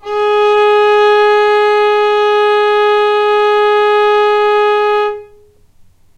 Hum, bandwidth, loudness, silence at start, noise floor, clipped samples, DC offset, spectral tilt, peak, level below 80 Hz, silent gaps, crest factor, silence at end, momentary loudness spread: none; 8.4 kHz; -10 LUFS; 0.05 s; -45 dBFS; under 0.1%; under 0.1%; -2.5 dB/octave; 0 dBFS; -52 dBFS; none; 10 dB; 0.95 s; 3 LU